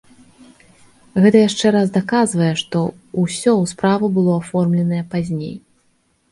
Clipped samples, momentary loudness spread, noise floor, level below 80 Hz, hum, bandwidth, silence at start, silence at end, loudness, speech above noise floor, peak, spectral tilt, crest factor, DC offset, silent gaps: under 0.1%; 10 LU; -62 dBFS; -56 dBFS; none; 11.5 kHz; 1.15 s; 0.75 s; -17 LUFS; 45 dB; 0 dBFS; -6 dB/octave; 18 dB; under 0.1%; none